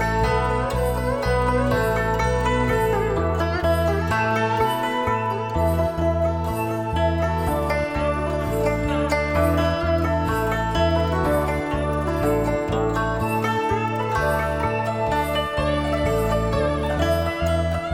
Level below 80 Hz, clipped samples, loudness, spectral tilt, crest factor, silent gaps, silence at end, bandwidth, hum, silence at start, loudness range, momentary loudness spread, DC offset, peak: -30 dBFS; under 0.1%; -22 LUFS; -6.5 dB/octave; 14 dB; none; 0 s; 16.5 kHz; none; 0 s; 1 LU; 3 LU; under 0.1%; -8 dBFS